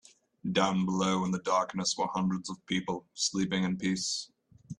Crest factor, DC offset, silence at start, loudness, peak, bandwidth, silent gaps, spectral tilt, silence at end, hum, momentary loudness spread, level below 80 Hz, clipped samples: 20 dB; under 0.1%; 0.45 s; -31 LUFS; -12 dBFS; 10.5 kHz; none; -4 dB/octave; 0.05 s; none; 8 LU; -66 dBFS; under 0.1%